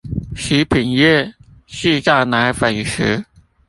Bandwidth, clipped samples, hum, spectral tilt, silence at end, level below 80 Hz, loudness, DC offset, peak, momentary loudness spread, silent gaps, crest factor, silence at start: 11.5 kHz; under 0.1%; none; -5 dB/octave; 0.45 s; -38 dBFS; -16 LUFS; under 0.1%; -2 dBFS; 11 LU; none; 16 dB; 0.05 s